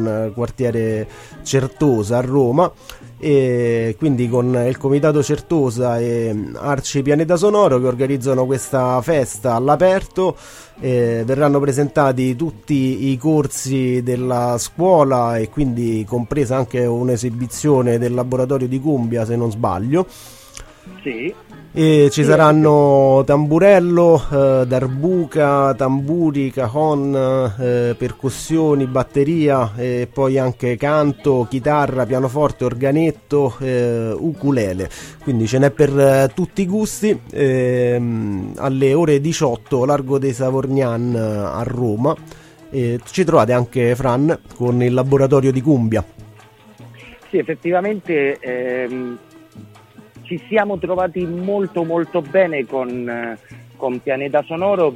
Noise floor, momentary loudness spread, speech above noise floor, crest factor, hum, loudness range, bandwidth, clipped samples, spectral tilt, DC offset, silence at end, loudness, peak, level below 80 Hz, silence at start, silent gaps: -44 dBFS; 9 LU; 28 dB; 16 dB; none; 6 LU; 16 kHz; under 0.1%; -7 dB/octave; under 0.1%; 0 s; -17 LUFS; 0 dBFS; -44 dBFS; 0 s; none